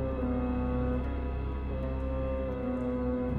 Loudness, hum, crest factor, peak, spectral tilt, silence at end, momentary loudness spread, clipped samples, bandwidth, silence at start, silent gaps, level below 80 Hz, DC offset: -33 LUFS; none; 12 dB; -20 dBFS; -10.5 dB/octave; 0 s; 4 LU; under 0.1%; 4.3 kHz; 0 s; none; -36 dBFS; 0.2%